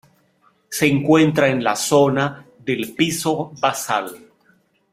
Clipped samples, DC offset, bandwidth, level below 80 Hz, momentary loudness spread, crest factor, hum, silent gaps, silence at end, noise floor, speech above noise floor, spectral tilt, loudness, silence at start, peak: under 0.1%; under 0.1%; 16 kHz; -58 dBFS; 10 LU; 18 dB; none; none; 0.75 s; -60 dBFS; 42 dB; -4.5 dB/octave; -19 LUFS; 0.7 s; -2 dBFS